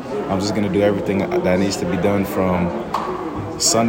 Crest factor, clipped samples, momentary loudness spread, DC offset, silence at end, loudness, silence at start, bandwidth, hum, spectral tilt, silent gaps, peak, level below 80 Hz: 16 dB; under 0.1%; 6 LU; under 0.1%; 0 s; -20 LUFS; 0 s; 16.5 kHz; none; -4.5 dB/octave; none; -4 dBFS; -46 dBFS